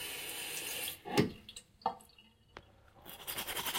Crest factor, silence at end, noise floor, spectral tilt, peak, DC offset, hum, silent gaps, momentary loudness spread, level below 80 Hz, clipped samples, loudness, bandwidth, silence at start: 26 dB; 0 s; -64 dBFS; -3 dB/octave; -14 dBFS; under 0.1%; none; none; 23 LU; -66 dBFS; under 0.1%; -38 LUFS; 17 kHz; 0 s